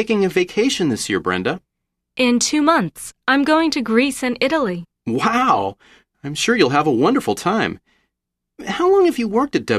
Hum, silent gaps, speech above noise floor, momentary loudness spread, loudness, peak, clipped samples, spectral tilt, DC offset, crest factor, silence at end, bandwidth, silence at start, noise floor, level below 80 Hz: none; none; 62 dB; 12 LU; -18 LUFS; -2 dBFS; under 0.1%; -4 dB/octave; under 0.1%; 16 dB; 0 s; 14 kHz; 0 s; -79 dBFS; -54 dBFS